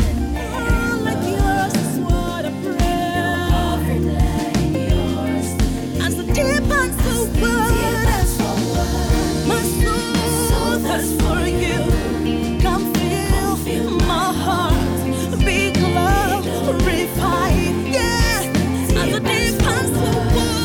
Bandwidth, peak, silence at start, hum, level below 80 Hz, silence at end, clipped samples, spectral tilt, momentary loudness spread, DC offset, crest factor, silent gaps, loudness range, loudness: over 20 kHz; -6 dBFS; 0 s; none; -24 dBFS; 0 s; under 0.1%; -5 dB/octave; 4 LU; under 0.1%; 12 dB; none; 2 LU; -19 LUFS